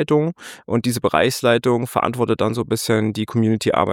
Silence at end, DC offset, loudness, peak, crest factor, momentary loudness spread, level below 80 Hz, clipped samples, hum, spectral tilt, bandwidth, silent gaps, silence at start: 0 s; under 0.1%; -19 LUFS; -2 dBFS; 18 dB; 5 LU; -52 dBFS; under 0.1%; none; -5.5 dB/octave; 17.5 kHz; none; 0 s